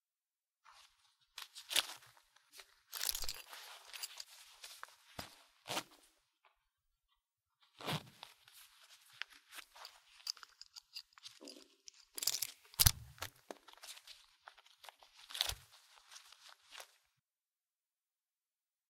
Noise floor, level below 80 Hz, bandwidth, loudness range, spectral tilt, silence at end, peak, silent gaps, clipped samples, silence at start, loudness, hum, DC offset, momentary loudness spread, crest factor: under -90 dBFS; -60 dBFS; 16.5 kHz; 13 LU; -1 dB/octave; 2.05 s; -6 dBFS; none; under 0.1%; 0.7 s; -40 LUFS; none; under 0.1%; 23 LU; 40 dB